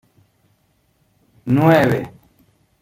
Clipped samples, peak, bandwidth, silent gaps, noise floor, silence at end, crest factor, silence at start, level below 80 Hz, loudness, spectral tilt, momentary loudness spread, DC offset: under 0.1%; -2 dBFS; 16.5 kHz; none; -62 dBFS; 0.75 s; 18 dB; 1.45 s; -54 dBFS; -16 LUFS; -8 dB/octave; 22 LU; under 0.1%